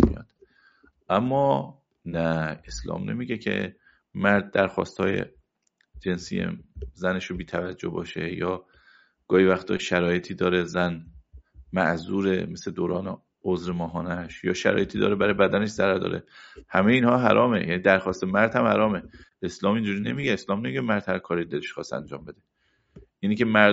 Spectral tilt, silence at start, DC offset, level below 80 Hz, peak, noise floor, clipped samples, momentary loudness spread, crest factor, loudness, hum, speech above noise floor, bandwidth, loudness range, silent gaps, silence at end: -5 dB/octave; 0 s; under 0.1%; -48 dBFS; 0 dBFS; -71 dBFS; under 0.1%; 13 LU; 24 dB; -25 LUFS; none; 47 dB; 8 kHz; 7 LU; none; 0 s